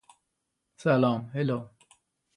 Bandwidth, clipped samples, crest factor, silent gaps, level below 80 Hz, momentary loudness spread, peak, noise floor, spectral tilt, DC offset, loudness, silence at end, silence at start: 10.5 kHz; under 0.1%; 20 dB; none; -70 dBFS; 11 LU; -10 dBFS; -81 dBFS; -8 dB/octave; under 0.1%; -28 LUFS; 0.7 s; 0.8 s